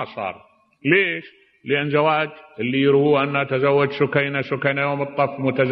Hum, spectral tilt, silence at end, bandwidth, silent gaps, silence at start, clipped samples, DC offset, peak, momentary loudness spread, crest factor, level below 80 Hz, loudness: none; -9.5 dB/octave; 0 s; 5.6 kHz; none; 0 s; under 0.1%; under 0.1%; -2 dBFS; 11 LU; 18 dB; -66 dBFS; -20 LUFS